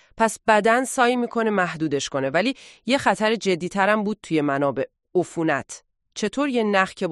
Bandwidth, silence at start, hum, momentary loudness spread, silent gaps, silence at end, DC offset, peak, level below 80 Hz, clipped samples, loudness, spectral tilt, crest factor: 12 kHz; 0.15 s; none; 8 LU; none; 0 s; under 0.1%; -4 dBFS; -60 dBFS; under 0.1%; -22 LUFS; -4.5 dB/octave; 18 dB